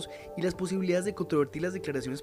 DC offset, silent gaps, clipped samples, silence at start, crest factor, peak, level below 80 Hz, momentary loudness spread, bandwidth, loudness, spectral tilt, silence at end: under 0.1%; none; under 0.1%; 0 s; 16 dB; -16 dBFS; -58 dBFS; 5 LU; 15.5 kHz; -31 LUFS; -6 dB/octave; 0 s